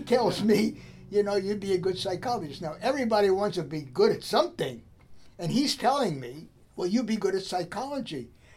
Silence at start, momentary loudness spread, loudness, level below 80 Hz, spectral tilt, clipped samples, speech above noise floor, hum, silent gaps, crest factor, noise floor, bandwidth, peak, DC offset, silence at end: 0 s; 13 LU; -28 LUFS; -60 dBFS; -5 dB/octave; under 0.1%; 24 dB; none; none; 18 dB; -51 dBFS; 15.5 kHz; -10 dBFS; under 0.1%; 0.3 s